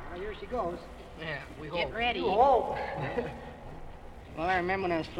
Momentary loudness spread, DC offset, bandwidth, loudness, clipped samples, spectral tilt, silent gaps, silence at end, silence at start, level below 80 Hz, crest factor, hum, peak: 22 LU; under 0.1%; 12 kHz; -31 LUFS; under 0.1%; -6 dB/octave; none; 0 s; 0 s; -48 dBFS; 20 dB; none; -12 dBFS